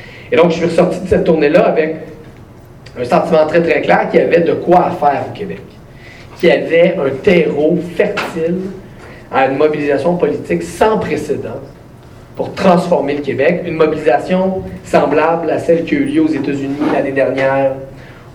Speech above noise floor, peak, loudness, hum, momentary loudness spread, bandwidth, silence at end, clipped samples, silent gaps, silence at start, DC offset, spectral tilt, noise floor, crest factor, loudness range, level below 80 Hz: 24 dB; 0 dBFS; -13 LUFS; none; 13 LU; 18.5 kHz; 0 s; under 0.1%; none; 0 s; under 0.1%; -7 dB/octave; -37 dBFS; 14 dB; 3 LU; -42 dBFS